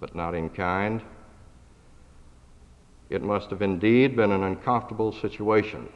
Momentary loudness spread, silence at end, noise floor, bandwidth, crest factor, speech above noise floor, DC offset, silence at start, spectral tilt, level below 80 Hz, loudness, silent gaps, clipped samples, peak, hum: 11 LU; 0.05 s; -52 dBFS; 9.8 kHz; 18 dB; 27 dB; under 0.1%; 0 s; -8 dB/octave; -52 dBFS; -25 LUFS; none; under 0.1%; -8 dBFS; 60 Hz at -55 dBFS